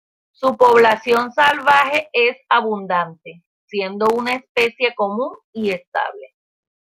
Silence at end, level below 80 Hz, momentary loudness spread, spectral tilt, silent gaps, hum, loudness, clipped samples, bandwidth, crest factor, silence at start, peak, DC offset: 0.55 s; -62 dBFS; 12 LU; -4 dB/octave; 3.46-3.68 s, 4.49-4.55 s, 5.44-5.53 s, 5.87-5.92 s; none; -17 LUFS; under 0.1%; 16 kHz; 18 dB; 0.4 s; -2 dBFS; under 0.1%